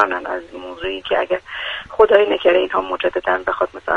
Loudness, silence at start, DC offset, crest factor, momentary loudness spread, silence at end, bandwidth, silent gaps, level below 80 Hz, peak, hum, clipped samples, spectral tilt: -18 LUFS; 0 s; under 0.1%; 18 dB; 13 LU; 0 s; 7 kHz; none; -48 dBFS; 0 dBFS; none; under 0.1%; -5 dB/octave